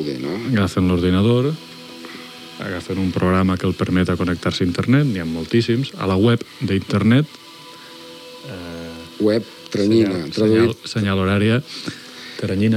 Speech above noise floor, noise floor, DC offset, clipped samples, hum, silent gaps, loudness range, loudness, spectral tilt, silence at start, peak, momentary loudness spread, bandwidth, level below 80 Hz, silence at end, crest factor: 22 dB; -39 dBFS; under 0.1%; under 0.1%; none; none; 3 LU; -19 LUFS; -7 dB/octave; 0 s; -2 dBFS; 18 LU; 15.5 kHz; -48 dBFS; 0 s; 16 dB